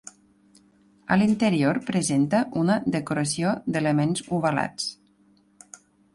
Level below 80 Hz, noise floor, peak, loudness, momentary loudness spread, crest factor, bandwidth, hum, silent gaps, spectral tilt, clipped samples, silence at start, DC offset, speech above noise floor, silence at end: -60 dBFS; -60 dBFS; -6 dBFS; -24 LUFS; 5 LU; 18 dB; 11.5 kHz; none; none; -5.5 dB/octave; under 0.1%; 1.1 s; under 0.1%; 37 dB; 1.2 s